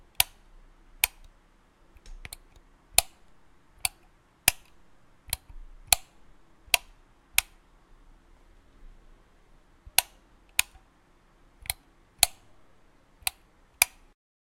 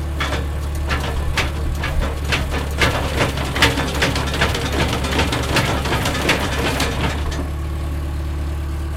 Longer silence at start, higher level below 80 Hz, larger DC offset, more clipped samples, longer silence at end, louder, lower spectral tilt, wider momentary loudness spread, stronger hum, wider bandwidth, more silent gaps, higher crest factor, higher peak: first, 0.2 s vs 0 s; second, -52 dBFS vs -24 dBFS; neither; neither; first, 0.65 s vs 0 s; second, -27 LUFS vs -20 LUFS; second, 1 dB/octave vs -4.5 dB/octave; first, 20 LU vs 7 LU; neither; about the same, 16.5 kHz vs 16.5 kHz; neither; first, 34 dB vs 20 dB; about the same, 0 dBFS vs 0 dBFS